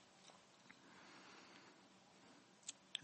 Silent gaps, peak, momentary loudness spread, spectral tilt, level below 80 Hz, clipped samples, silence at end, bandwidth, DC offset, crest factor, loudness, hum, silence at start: none; -26 dBFS; 11 LU; -1 dB/octave; under -90 dBFS; under 0.1%; 0 s; 8.4 kHz; under 0.1%; 34 dB; -60 LUFS; none; 0 s